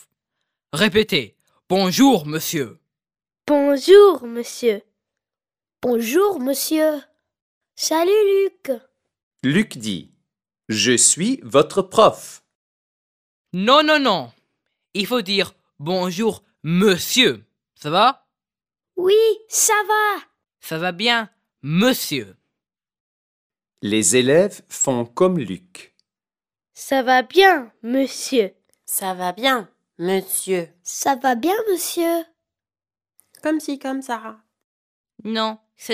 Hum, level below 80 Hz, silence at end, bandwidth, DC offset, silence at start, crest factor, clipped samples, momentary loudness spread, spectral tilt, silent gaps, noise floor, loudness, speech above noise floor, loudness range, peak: none; -64 dBFS; 0 s; 16 kHz; under 0.1%; 0.75 s; 20 dB; under 0.1%; 15 LU; -3.5 dB/octave; 7.42-7.61 s, 9.23-9.31 s, 12.55-13.45 s, 23.00-23.50 s, 34.64-35.04 s; under -90 dBFS; -18 LUFS; over 72 dB; 5 LU; 0 dBFS